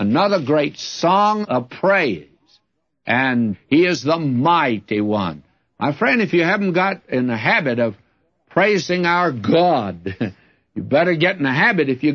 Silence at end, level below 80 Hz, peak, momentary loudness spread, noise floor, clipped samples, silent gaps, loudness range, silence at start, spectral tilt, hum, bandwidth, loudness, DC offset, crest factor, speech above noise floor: 0 s; -62 dBFS; -4 dBFS; 9 LU; -67 dBFS; under 0.1%; none; 1 LU; 0 s; -6 dB/octave; none; 7.4 kHz; -18 LUFS; under 0.1%; 16 dB; 49 dB